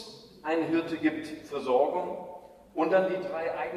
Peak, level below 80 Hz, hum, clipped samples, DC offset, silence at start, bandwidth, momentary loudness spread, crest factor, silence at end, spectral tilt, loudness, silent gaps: -12 dBFS; -68 dBFS; none; under 0.1%; under 0.1%; 0 s; 13 kHz; 14 LU; 18 dB; 0 s; -6 dB/octave; -29 LUFS; none